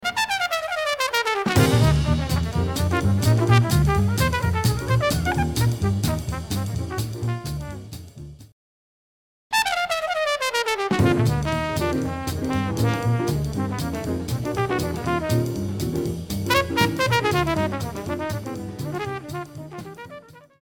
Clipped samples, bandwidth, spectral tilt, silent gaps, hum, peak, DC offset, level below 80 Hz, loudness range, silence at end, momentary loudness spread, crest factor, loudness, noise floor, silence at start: under 0.1%; 17.5 kHz; -5.5 dB/octave; 8.52-9.50 s; none; -4 dBFS; under 0.1%; -36 dBFS; 8 LU; 0.25 s; 12 LU; 18 dB; -23 LUFS; -44 dBFS; 0 s